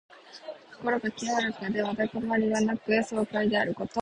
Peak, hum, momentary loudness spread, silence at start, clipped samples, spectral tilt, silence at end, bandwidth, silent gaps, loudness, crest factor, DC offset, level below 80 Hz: -12 dBFS; none; 17 LU; 0.1 s; under 0.1%; -5 dB/octave; 0 s; 10.5 kHz; none; -28 LUFS; 18 dB; under 0.1%; -64 dBFS